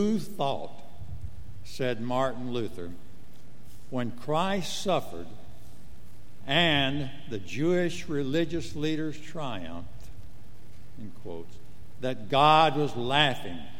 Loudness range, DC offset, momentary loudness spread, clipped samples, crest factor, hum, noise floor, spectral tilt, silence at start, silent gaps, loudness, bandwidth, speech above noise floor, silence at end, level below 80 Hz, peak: 8 LU; 3%; 23 LU; under 0.1%; 24 dB; none; -52 dBFS; -5 dB/octave; 0 s; none; -28 LUFS; 16.5 kHz; 24 dB; 0 s; -52 dBFS; -8 dBFS